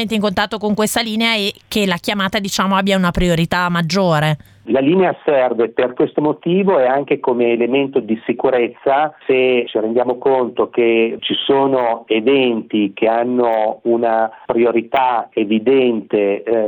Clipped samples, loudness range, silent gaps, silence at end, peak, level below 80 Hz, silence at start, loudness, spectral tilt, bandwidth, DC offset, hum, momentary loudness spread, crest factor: under 0.1%; 1 LU; none; 0 s; 0 dBFS; -42 dBFS; 0 s; -16 LUFS; -5.5 dB/octave; 18 kHz; under 0.1%; none; 4 LU; 16 dB